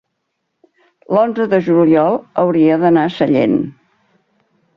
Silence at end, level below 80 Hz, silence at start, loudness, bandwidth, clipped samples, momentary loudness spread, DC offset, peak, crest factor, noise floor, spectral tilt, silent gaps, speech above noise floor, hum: 1.05 s; -58 dBFS; 1.1 s; -14 LUFS; 5.8 kHz; under 0.1%; 5 LU; under 0.1%; -2 dBFS; 14 dB; -72 dBFS; -9 dB/octave; none; 59 dB; none